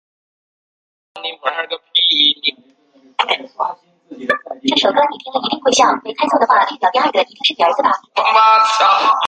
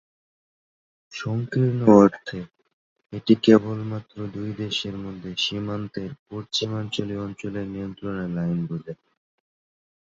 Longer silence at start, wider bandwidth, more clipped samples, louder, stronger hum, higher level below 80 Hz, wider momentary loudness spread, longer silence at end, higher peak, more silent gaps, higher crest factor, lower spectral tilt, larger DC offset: about the same, 1.15 s vs 1.1 s; first, 9.4 kHz vs 7.8 kHz; neither; first, -14 LUFS vs -23 LUFS; neither; second, -68 dBFS vs -56 dBFS; second, 12 LU vs 18 LU; second, 0 s vs 1.15 s; about the same, 0 dBFS vs -2 dBFS; second, none vs 2.73-2.96 s, 6.19-6.26 s; second, 16 dB vs 22 dB; second, -1 dB/octave vs -6.5 dB/octave; neither